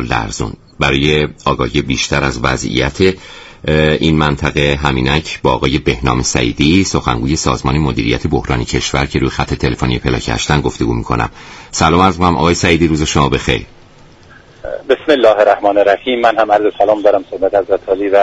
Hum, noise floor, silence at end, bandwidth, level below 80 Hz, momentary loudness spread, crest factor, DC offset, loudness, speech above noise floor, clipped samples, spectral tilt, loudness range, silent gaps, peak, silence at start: none; -41 dBFS; 0 s; 8.6 kHz; -28 dBFS; 7 LU; 14 dB; under 0.1%; -13 LUFS; 28 dB; under 0.1%; -5 dB/octave; 3 LU; none; 0 dBFS; 0 s